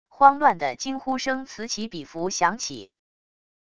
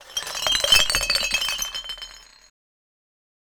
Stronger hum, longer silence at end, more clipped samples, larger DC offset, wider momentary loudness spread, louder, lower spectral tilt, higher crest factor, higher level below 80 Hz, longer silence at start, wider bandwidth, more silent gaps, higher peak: neither; second, 0.8 s vs 1.3 s; neither; first, 0.4% vs under 0.1%; second, 15 LU vs 18 LU; second, -24 LUFS vs -20 LUFS; first, -3 dB/octave vs 1 dB/octave; about the same, 24 dB vs 24 dB; second, -62 dBFS vs -44 dBFS; about the same, 0.1 s vs 0 s; second, 10 kHz vs over 20 kHz; neither; about the same, 0 dBFS vs -2 dBFS